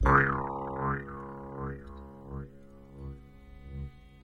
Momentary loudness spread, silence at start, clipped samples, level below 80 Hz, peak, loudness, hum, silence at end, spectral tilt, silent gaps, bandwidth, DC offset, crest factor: 22 LU; 0 s; under 0.1%; -42 dBFS; -8 dBFS; -33 LUFS; none; 0 s; -8.5 dB/octave; none; 6.4 kHz; under 0.1%; 26 dB